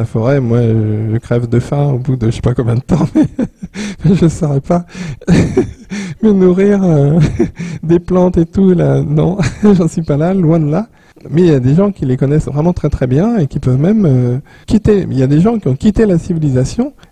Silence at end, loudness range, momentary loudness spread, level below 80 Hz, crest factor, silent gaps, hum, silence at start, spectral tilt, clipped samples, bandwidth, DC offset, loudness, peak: 0.2 s; 3 LU; 7 LU; -30 dBFS; 12 dB; none; none; 0 s; -8.5 dB/octave; under 0.1%; 10 kHz; 0.4%; -12 LUFS; 0 dBFS